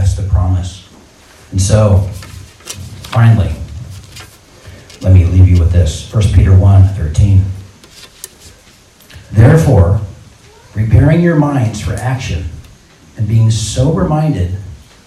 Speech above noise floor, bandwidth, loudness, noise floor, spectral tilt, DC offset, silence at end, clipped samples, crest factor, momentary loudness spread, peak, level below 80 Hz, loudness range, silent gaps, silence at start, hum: 34 dB; 12 kHz; -11 LUFS; -43 dBFS; -7 dB/octave; under 0.1%; 0.3 s; 1%; 12 dB; 21 LU; 0 dBFS; -26 dBFS; 5 LU; none; 0 s; none